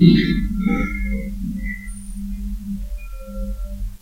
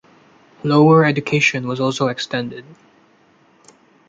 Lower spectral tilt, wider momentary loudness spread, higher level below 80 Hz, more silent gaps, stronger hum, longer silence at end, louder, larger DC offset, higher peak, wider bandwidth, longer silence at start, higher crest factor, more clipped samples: about the same, -7 dB/octave vs -6 dB/octave; about the same, 13 LU vs 15 LU; first, -28 dBFS vs -60 dBFS; neither; neither; second, 0 s vs 1.35 s; second, -24 LUFS vs -16 LUFS; first, 0.6% vs under 0.1%; about the same, 0 dBFS vs -2 dBFS; first, 16 kHz vs 7.8 kHz; second, 0 s vs 0.65 s; about the same, 20 dB vs 16 dB; neither